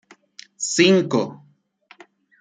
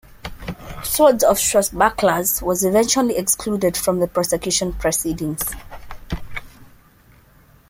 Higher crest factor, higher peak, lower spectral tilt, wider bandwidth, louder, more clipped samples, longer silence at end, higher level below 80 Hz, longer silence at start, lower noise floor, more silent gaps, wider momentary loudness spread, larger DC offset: about the same, 20 dB vs 18 dB; about the same, -2 dBFS vs -2 dBFS; about the same, -4 dB/octave vs -3.5 dB/octave; second, 9.6 kHz vs 16.5 kHz; about the same, -19 LUFS vs -18 LUFS; neither; about the same, 1.05 s vs 1.05 s; second, -68 dBFS vs -40 dBFS; first, 0.6 s vs 0.25 s; first, -58 dBFS vs -51 dBFS; neither; second, 13 LU vs 18 LU; neither